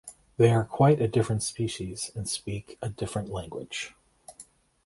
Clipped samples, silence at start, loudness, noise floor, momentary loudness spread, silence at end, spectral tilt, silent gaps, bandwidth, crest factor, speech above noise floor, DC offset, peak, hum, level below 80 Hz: under 0.1%; 0.05 s; -28 LUFS; -54 dBFS; 15 LU; 0.45 s; -5.5 dB/octave; none; 11.5 kHz; 20 dB; 28 dB; under 0.1%; -8 dBFS; none; -54 dBFS